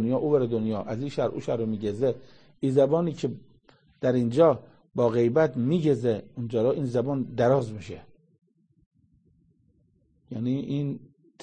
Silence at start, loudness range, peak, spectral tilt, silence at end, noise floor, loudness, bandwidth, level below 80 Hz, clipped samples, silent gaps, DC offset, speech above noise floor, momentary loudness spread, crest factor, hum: 0 s; 10 LU; -8 dBFS; -8.5 dB/octave; 0.45 s; -66 dBFS; -26 LUFS; 9.4 kHz; -62 dBFS; under 0.1%; 8.86-8.91 s; under 0.1%; 41 dB; 13 LU; 20 dB; none